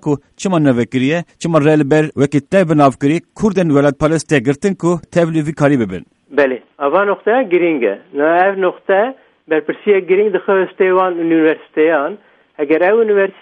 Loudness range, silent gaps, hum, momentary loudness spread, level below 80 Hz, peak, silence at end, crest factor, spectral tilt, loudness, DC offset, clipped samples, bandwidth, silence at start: 2 LU; none; none; 6 LU; -50 dBFS; 0 dBFS; 0.1 s; 14 dB; -7 dB/octave; -14 LUFS; under 0.1%; under 0.1%; 11 kHz; 0.05 s